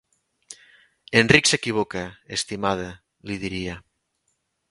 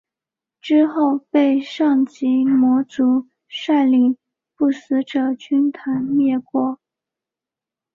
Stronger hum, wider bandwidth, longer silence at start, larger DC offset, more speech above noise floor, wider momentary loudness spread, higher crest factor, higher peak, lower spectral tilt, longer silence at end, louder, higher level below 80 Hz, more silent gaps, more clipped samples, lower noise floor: neither; first, 11.5 kHz vs 7.2 kHz; second, 0.5 s vs 0.65 s; neither; second, 51 dB vs 71 dB; first, 25 LU vs 8 LU; first, 26 dB vs 14 dB; first, 0 dBFS vs -6 dBFS; second, -3.5 dB/octave vs -6 dB/octave; second, 0.9 s vs 1.2 s; second, -22 LUFS vs -18 LUFS; first, -50 dBFS vs -66 dBFS; neither; neither; second, -73 dBFS vs -88 dBFS